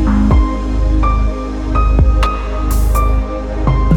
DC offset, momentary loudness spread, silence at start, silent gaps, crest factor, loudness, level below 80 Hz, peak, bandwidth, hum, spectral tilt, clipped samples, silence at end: under 0.1%; 6 LU; 0 s; none; 12 dB; -15 LUFS; -14 dBFS; 0 dBFS; 15 kHz; none; -7.5 dB/octave; under 0.1%; 0 s